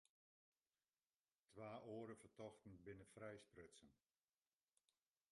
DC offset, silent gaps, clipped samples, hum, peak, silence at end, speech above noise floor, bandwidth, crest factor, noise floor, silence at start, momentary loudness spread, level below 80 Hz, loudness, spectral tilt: under 0.1%; none; under 0.1%; none; -42 dBFS; 1.35 s; over 28 dB; 11.5 kHz; 20 dB; under -90 dBFS; 1.5 s; 10 LU; -86 dBFS; -60 LUFS; -6 dB/octave